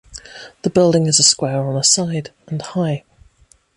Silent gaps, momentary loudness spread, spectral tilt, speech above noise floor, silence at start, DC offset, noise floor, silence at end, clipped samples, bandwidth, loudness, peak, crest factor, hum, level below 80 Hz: none; 17 LU; -3.5 dB/octave; 37 dB; 0.1 s; under 0.1%; -54 dBFS; 0.75 s; under 0.1%; 11.5 kHz; -15 LUFS; 0 dBFS; 18 dB; none; -52 dBFS